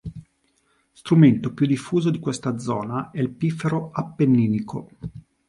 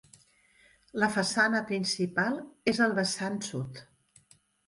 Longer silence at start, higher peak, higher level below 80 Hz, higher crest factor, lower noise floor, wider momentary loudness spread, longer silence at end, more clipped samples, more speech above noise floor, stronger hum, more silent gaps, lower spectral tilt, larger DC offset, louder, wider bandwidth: second, 0.05 s vs 0.95 s; first, -2 dBFS vs -12 dBFS; first, -54 dBFS vs -68 dBFS; about the same, 20 dB vs 20 dB; about the same, -66 dBFS vs -63 dBFS; first, 20 LU vs 12 LU; second, 0.3 s vs 0.85 s; neither; first, 45 dB vs 34 dB; neither; neither; first, -7.5 dB/octave vs -4 dB/octave; neither; first, -22 LUFS vs -29 LUFS; about the same, 11.5 kHz vs 11.5 kHz